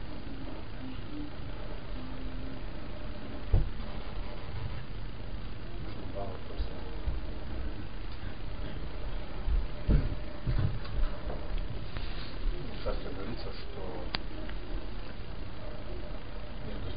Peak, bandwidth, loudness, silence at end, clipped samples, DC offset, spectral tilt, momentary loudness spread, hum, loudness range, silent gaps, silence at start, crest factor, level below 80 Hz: -8 dBFS; 5.2 kHz; -39 LUFS; 0 s; under 0.1%; 2%; -10 dB/octave; 10 LU; none; 6 LU; none; 0 s; 28 dB; -38 dBFS